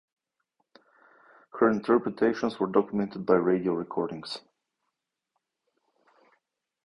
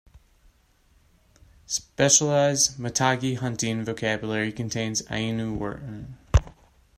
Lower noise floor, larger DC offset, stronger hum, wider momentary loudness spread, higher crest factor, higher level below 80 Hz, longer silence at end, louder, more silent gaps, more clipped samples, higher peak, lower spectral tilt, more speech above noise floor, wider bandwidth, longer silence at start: first, -84 dBFS vs -61 dBFS; neither; neither; about the same, 13 LU vs 12 LU; about the same, 22 dB vs 22 dB; second, -66 dBFS vs -38 dBFS; first, 2.5 s vs 0.5 s; second, -27 LUFS vs -24 LUFS; neither; neither; second, -8 dBFS vs -4 dBFS; first, -7.5 dB/octave vs -3.5 dB/octave; first, 58 dB vs 36 dB; second, 10.5 kHz vs 15.5 kHz; second, 1.55 s vs 1.7 s